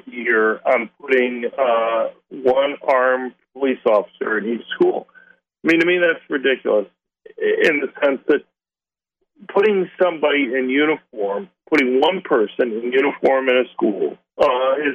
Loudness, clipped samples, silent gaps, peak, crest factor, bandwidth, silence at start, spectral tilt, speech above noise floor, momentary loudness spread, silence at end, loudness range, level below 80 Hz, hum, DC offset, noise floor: -19 LUFS; under 0.1%; none; -2 dBFS; 16 dB; 8.2 kHz; 0.05 s; -5.5 dB/octave; over 72 dB; 7 LU; 0 s; 2 LU; -66 dBFS; none; under 0.1%; under -90 dBFS